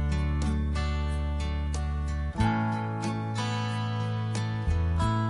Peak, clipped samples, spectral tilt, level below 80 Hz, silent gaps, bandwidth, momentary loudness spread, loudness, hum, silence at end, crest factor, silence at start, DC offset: -12 dBFS; under 0.1%; -6.5 dB/octave; -32 dBFS; none; 11.5 kHz; 4 LU; -30 LUFS; none; 0 s; 16 dB; 0 s; under 0.1%